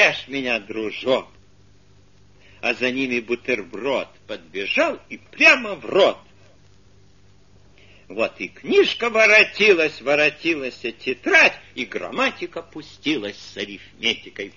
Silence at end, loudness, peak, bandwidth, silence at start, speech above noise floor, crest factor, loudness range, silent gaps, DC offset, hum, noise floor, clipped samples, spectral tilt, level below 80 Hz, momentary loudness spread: 0.05 s; -19 LUFS; -2 dBFS; 7.4 kHz; 0 s; 33 dB; 20 dB; 8 LU; none; 0.2%; 50 Hz at -60 dBFS; -54 dBFS; under 0.1%; -3 dB/octave; -60 dBFS; 19 LU